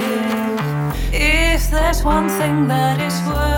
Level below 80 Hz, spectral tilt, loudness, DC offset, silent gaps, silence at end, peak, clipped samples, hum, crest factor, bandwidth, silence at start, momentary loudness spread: -22 dBFS; -5 dB/octave; -17 LUFS; under 0.1%; none; 0 s; -2 dBFS; under 0.1%; none; 14 dB; 19 kHz; 0 s; 5 LU